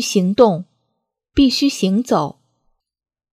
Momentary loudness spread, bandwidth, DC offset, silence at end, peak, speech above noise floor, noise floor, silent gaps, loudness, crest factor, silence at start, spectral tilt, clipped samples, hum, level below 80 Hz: 10 LU; 15 kHz; under 0.1%; 1.05 s; 0 dBFS; 59 dB; -74 dBFS; none; -16 LUFS; 18 dB; 0 s; -5 dB/octave; under 0.1%; none; -42 dBFS